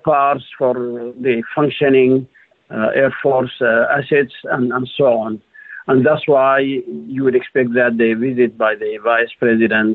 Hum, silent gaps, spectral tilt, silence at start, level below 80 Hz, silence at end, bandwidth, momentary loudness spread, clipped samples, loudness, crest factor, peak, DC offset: none; none; -9.5 dB/octave; 0.05 s; -60 dBFS; 0 s; 4.2 kHz; 8 LU; under 0.1%; -16 LUFS; 12 dB; -4 dBFS; under 0.1%